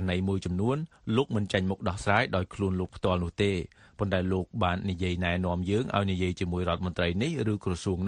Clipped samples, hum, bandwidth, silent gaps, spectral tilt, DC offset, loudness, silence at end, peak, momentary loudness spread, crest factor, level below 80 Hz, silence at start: under 0.1%; none; 10.5 kHz; none; -6.5 dB/octave; under 0.1%; -29 LUFS; 0 s; -10 dBFS; 4 LU; 20 dB; -48 dBFS; 0 s